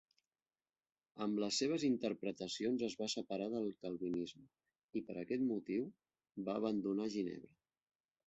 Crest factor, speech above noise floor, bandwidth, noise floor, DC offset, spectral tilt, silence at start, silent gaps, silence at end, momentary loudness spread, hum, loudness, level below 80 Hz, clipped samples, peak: 16 dB; over 50 dB; 8 kHz; under -90 dBFS; under 0.1%; -4.5 dB/octave; 1.15 s; 4.84-4.88 s; 0.85 s; 10 LU; none; -41 LUFS; -80 dBFS; under 0.1%; -24 dBFS